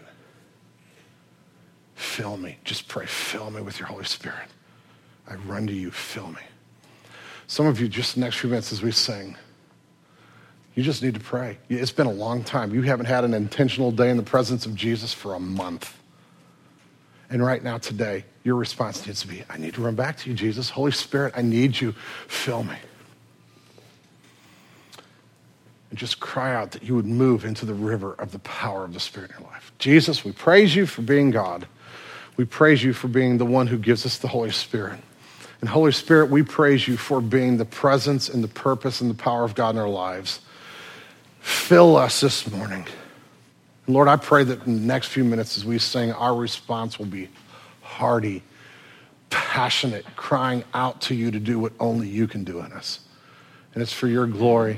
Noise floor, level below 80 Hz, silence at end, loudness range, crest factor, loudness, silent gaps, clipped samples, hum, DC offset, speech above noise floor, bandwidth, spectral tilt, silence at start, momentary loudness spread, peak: -57 dBFS; -68 dBFS; 0 s; 12 LU; 22 dB; -22 LUFS; none; under 0.1%; none; under 0.1%; 35 dB; 16 kHz; -5.5 dB/octave; 2 s; 17 LU; 0 dBFS